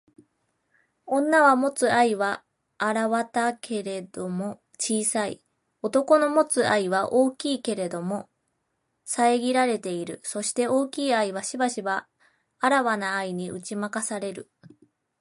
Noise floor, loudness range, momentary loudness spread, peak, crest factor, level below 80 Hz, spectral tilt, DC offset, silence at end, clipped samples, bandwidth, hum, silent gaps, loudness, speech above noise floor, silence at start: -76 dBFS; 4 LU; 12 LU; -6 dBFS; 20 dB; -74 dBFS; -3.5 dB/octave; under 0.1%; 0.8 s; under 0.1%; 11.5 kHz; none; none; -25 LUFS; 52 dB; 1.05 s